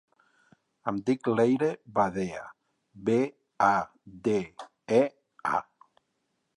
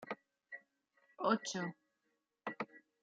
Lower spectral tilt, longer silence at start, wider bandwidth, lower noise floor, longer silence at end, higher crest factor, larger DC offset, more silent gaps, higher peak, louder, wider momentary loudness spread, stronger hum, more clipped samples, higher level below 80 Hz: first, -7 dB/octave vs -3.5 dB/octave; first, 0.85 s vs 0 s; first, 11.5 kHz vs 7.4 kHz; second, -78 dBFS vs -85 dBFS; first, 0.95 s vs 0.25 s; about the same, 20 dB vs 24 dB; neither; neither; first, -8 dBFS vs -20 dBFS; first, -28 LUFS vs -41 LUFS; second, 13 LU vs 18 LU; neither; neither; first, -66 dBFS vs under -90 dBFS